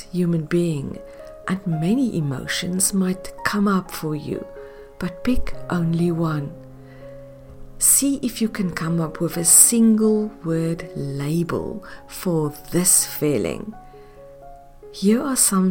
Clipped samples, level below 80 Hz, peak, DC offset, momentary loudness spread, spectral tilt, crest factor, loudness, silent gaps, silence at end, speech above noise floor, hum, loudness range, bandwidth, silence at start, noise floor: under 0.1%; -42 dBFS; 0 dBFS; under 0.1%; 18 LU; -4 dB/octave; 22 dB; -20 LUFS; none; 0 s; 22 dB; none; 8 LU; 17 kHz; 0 s; -43 dBFS